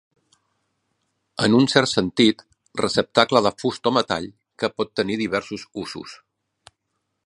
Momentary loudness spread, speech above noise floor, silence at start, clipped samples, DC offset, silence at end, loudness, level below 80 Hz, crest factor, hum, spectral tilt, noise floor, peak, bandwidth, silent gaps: 16 LU; 56 dB; 1.4 s; under 0.1%; under 0.1%; 1.1 s; -21 LUFS; -58 dBFS; 22 dB; none; -4.5 dB/octave; -76 dBFS; 0 dBFS; 11.5 kHz; none